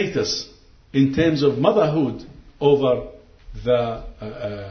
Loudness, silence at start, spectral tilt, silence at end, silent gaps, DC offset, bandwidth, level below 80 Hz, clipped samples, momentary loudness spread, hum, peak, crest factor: -21 LUFS; 0 s; -6 dB/octave; 0 s; none; under 0.1%; 6.6 kHz; -44 dBFS; under 0.1%; 16 LU; none; -2 dBFS; 20 dB